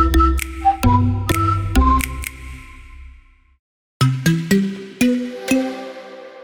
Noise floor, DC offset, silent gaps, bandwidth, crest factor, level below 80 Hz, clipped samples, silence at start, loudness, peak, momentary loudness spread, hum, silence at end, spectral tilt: -46 dBFS; under 0.1%; 3.59-4.00 s; 19 kHz; 16 dB; -26 dBFS; under 0.1%; 0 s; -18 LUFS; -2 dBFS; 18 LU; none; 0 s; -6 dB/octave